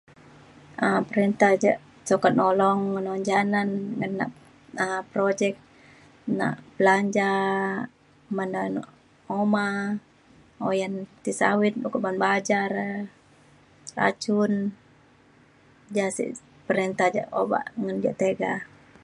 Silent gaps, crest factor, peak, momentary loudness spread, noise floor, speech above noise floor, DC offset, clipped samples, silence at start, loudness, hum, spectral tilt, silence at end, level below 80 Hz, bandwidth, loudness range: none; 20 dB; -4 dBFS; 12 LU; -57 dBFS; 32 dB; under 0.1%; under 0.1%; 0.8 s; -25 LUFS; none; -5.5 dB/octave; 0.4 s; -68 dBFS; 11.5 kHz; 6 LU